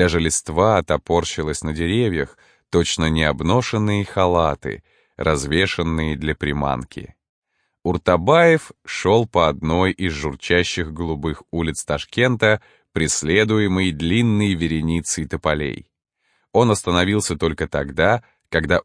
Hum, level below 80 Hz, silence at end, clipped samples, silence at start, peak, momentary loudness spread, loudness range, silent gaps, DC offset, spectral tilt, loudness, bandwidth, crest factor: none; -38 dBFS; 0.05 s; under 0.1%; 0 s; -2 dBFS; 8 LU; 3 LU; 7.29-7.42 s; under 0.1%; -5 dB/octave; -20 LUFS; 10.5 kHz; 18 dB